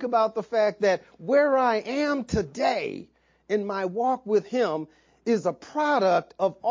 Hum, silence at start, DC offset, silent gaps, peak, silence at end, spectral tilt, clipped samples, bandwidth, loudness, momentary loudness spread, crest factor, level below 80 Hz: none; 0 s; under 0.1%; none; -10 dBFS; 0 s; -5.5 dB/octave; under 0.1%; 7.6 kHz; -25 LUFS; 8 LU; 16 dB; -54 dBFS